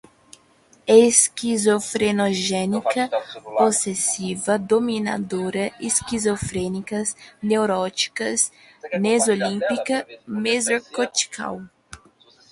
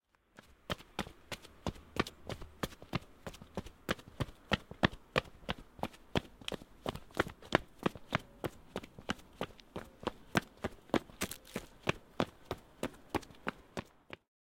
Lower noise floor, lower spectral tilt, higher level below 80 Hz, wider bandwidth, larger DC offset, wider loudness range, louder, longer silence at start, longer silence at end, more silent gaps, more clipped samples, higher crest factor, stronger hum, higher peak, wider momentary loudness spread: second, -56 dBFS vs -63 dBFS; second, -3 dB/octave vs -4.5 dB/octave; about the same, -54 dBFS vs -56 dBFS; second, 11.5 kHz vs 16.5 kHz; neither; about the same, 4 LU vs 4 LU; first, -21 LUFS vs -40 LUFS; first, 0.85 s vs 0.7 s; second, 0.55 s vs 0.7 s; neither; neither; second, 20 dB vs 34 dB; neither; first, -2 dBFS vs -8 dBFS; second, 9 LU vs 12 LU